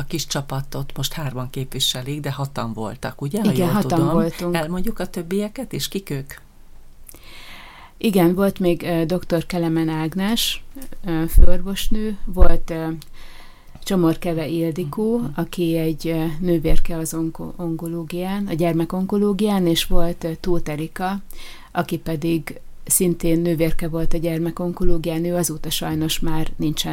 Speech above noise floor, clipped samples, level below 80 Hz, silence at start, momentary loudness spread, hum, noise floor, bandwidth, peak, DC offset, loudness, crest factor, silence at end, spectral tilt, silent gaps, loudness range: 22 dB; under 0.1%; -26 dBFS; 0 s; 10 LU; none; -40 dBFS; 16.5 kHz; 0 dBFS; under 0.1%; -22 LUFS; 18 dB; 0 s; -5 dB/octave; none; 3 LU